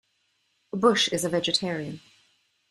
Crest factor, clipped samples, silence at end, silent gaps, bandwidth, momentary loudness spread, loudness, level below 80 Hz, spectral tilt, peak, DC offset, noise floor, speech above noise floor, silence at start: 22 dB; under 0.1%; 0.75 s; none; 15 kHz; 16 LU; -24 LUFS; -66 dBFS; -3.5 dB/octave; -6 dBFS; under 0.1%; -72 dBFS; 47 dB; 0.75 s